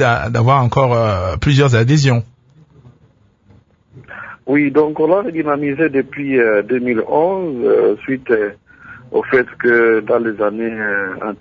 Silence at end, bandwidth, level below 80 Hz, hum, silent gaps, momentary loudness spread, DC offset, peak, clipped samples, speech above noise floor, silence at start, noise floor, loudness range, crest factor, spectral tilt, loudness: 0.05 s; 7.6 kHz; -42 dBFS; none; none; 8 LU; under 0.1%; 0 dBFS; under 0.1%; 38 dB; 0 s; -52 dBFS; 3 LU; 16 dB; -7 dB/octave; -15 LUFS